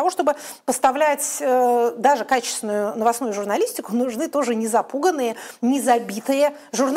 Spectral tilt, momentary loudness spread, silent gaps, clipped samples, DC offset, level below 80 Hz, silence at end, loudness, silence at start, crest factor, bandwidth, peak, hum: -3 dB/octave; 6 LU; none; under 0.1%; under 0.1%; -72 dBFS; 0 s; -21 LUFS; 0 s; 16 dB; 16 kHz; -4 dBFS; none